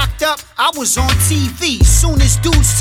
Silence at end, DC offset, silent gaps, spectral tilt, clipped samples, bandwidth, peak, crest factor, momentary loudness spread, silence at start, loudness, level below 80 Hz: 0 s; under 0.1%; none; -3.5 dB/octave; under 0.1%; 16.5 kHz; 0 dBFS; 12 dB; 5 LU; 0 s; -13 LUFS; -16 dBFS